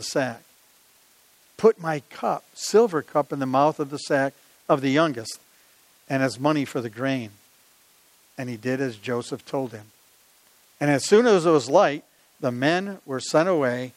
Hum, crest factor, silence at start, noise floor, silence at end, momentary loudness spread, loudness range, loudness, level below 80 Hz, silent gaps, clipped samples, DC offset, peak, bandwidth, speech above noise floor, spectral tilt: none; 20 dB; 0 s; -58 dBFS; 0.05 s; 15 LU; 9 LU; -23 LUFS; -76 dBFS; none; under 0.1%; under 0.1%; -4 dBFS; 16 kHz; 35 dB; -5 dB/octave